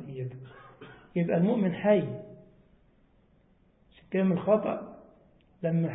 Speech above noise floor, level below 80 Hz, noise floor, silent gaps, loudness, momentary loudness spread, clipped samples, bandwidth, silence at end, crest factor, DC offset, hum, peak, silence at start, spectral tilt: 37 dB; -66 dBFS; -64 dBFS; none; -28 LUFS; 24 LU; under 0.1%; 3.9 kHz; 0 s; 20 dB; under 0.1%; none; -12 dBFS; 0 s; -12 dB/octave